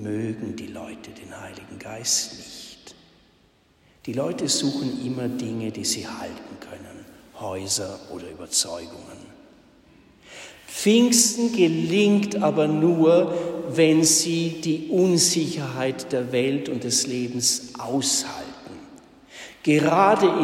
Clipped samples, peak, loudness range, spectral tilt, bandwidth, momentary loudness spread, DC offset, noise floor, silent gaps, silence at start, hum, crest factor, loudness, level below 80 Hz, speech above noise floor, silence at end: under 0.1%; -4 dBFS; 10 LU; -3.5 dB/octave; 16 kHz; 23 LU; under 0.1%; -60 dBFS; none; 0 s; none; 20 dB; -22 LUFS; -64 dBFS; 37 dB; 0 s